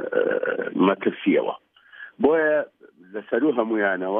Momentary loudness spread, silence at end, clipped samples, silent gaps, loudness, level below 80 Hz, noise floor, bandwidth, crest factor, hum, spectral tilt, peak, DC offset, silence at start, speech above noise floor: 17 LU; 0 s; under 0.1%; none; -22 LUFS; -70 dBFS; -45 dBFS; 3.8 kHz; 16 dB; none; -9.5 dB/octave; -6 dBFS; under 0.1%; 0 s; 24 dB